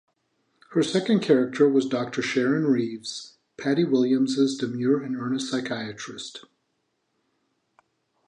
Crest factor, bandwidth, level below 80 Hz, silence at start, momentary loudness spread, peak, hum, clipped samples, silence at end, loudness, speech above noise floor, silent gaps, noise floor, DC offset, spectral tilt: 18 dB; 10.5 kHz; -74 dBFS; 0.7 s; 15 LU; -6 dBFS; none; under 0.1%; 1.85 s; -24 LUFS; 51 dB; none; -75 dBFS; under 0.1%; -5.5 dB/octave